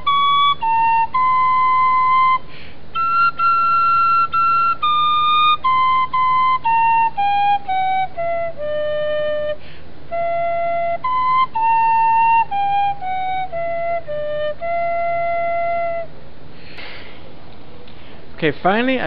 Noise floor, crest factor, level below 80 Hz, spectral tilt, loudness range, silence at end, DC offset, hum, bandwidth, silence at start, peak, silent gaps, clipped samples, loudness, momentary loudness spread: -40 dBFS; 14 dB; -48 dBFS; -8.5 dB/octave; 8 LU; 0 s; 5%; none; 5.4 kHz; 0 s; -4 dBFS; none; under 0.1%; -17 LUFS; 10 LU